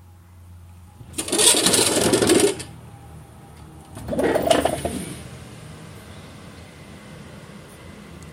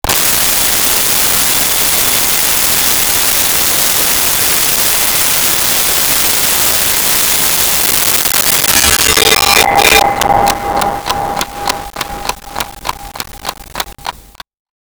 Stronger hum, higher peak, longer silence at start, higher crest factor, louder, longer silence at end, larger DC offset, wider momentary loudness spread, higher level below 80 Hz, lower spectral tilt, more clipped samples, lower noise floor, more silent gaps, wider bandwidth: neither; about the same, 0 dBFS vs 0 dBFS; first, 0.4 s vs 0.05 s; first, 24 dB vs 12 dB; second, -18 LUFS vs -8 LUFS; second, 0 s vs 0.65 s; neither; first, 26 LU vs 14 LU; second, -48 dBFS vs -34 dBFS; first, -2.5 dB/octave vs -0.5 dB/octave; neither; first, -46 dBFS vs -34 dBFS; neither; second, 16 kHz vs over 20 kHz